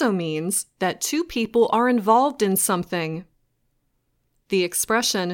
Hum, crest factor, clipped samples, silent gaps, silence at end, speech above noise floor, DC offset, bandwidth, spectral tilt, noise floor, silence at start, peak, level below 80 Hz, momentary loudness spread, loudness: none; 18 dB; under 0.1%; none; 0 s; 48 dB; under 0.1%; 17 kHz; -3.5 dB/octave; -70 dBFS; 0 s; -4 dBFS; -58 dBFS; 8 LU; -21 LUFS